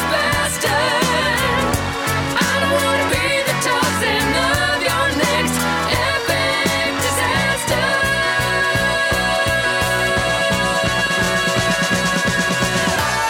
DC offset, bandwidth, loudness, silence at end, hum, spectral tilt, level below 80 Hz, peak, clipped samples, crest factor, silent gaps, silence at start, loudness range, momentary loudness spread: under 0.1%; 19 kHz; -17 LUFS; 0 s; none; -3 dB/octave; -36 dBFS; -2 dBFS; under 0.1%; 14 dB; none; 0 s; 0 LU; 1 LU